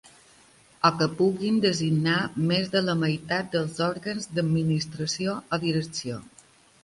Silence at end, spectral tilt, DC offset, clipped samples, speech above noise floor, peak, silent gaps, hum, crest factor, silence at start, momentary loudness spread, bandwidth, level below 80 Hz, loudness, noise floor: 0.55 s; -5.5 dB/octave; under 0.1%; under 0.1%; 31 dB; -6 dBFS; none; none; 22 dB; 0.85 s; 6 LU; 11.5 kHz; -60 dBFS; -26 LUFS; -56 dBFS